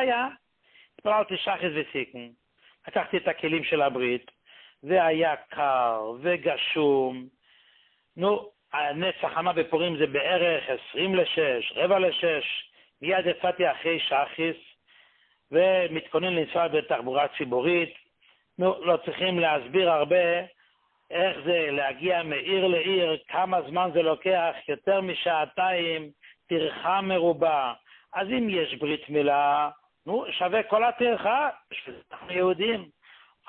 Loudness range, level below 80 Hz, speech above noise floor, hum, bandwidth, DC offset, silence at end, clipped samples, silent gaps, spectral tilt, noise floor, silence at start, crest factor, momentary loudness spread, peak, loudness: 3 LU; -68 dBFS; 41 dB; none; 4.3 kHz; under 0.1%; 0.65 s; under 0.1%; none; -9 dB/octave; -66 dBFS; 0 s; 16 dB; 9 LU; -10 dBFS; -26 LUFS